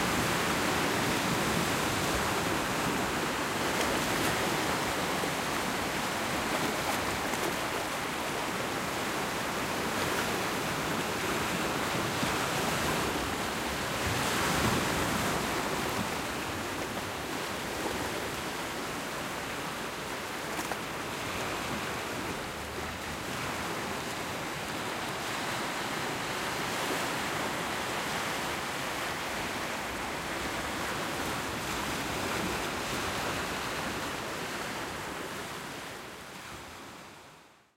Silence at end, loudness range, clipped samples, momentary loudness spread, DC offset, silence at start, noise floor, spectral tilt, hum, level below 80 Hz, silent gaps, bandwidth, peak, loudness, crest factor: 0.3 s; 5 LU; under 0.1%; 7 LU; under 0.1%; 0 s; -56 dBFS; -3 dB/octave; none; -52 dBFS; none; 16 kHz; -14 dBFS; -32 LUFS; 18 dB